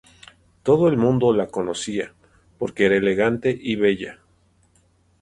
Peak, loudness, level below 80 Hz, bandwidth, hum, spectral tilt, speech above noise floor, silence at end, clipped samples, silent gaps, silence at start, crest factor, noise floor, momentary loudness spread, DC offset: -4 dBFS; -21 LUFS; -54 dBFS; 11 kHz; none; -6 dB/octave; 41 dB; 1.1 s; under 0.1%; none; 0.65 s; 18 dB; -60 dBFS; 12 LU; under 0.1%